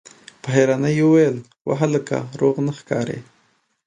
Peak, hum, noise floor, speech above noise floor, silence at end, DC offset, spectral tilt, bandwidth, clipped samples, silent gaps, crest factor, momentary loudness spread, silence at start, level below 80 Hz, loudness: -2 dBFS; none; -63 dBFS; 44 dB; 0.65 s; under 0.1%; -7 dB/octave; 10 kHz; under 0.1%; 1.61-1.65 s; 18 dB; 13 LU; 0.45 s; -62 dBFS; -20 LUFS